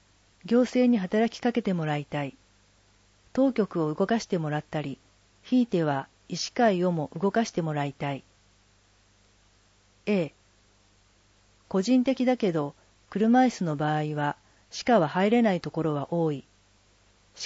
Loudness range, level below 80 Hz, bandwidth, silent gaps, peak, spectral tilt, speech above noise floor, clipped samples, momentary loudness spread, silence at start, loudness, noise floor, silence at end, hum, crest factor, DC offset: 8 LU; -64 dBFS; 8 kHz; none; -10 dBFS; -6.5 dB/octave; 37 dB; under 0.1%; 12 LU; 0.45 s; -27 LUFS; -62 dBFS; 0 s; 50 Hz at -60 dBFS; 18 dB; under 0.1%